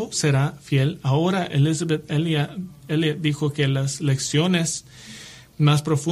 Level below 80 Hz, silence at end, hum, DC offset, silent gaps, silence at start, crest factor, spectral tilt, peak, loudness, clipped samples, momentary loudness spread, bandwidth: -56 dBFS; 0 s; none; under 0.1%; none; 0 s; 14 dB; -5.5 dB/octave; -8 dBFS; -22 LUFS; under 0.1%; 12 LU; 13 kHz